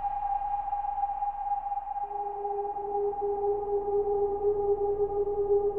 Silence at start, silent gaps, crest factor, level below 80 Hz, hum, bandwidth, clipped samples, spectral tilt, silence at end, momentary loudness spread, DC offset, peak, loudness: 0 s; none; 12 dB; -48 dBFS; none; 2.9 kHz; under 0.1%; -10 dB/octave; 0 s; 6 LU; under 0.1%; -16 dBFS; -30 LUFS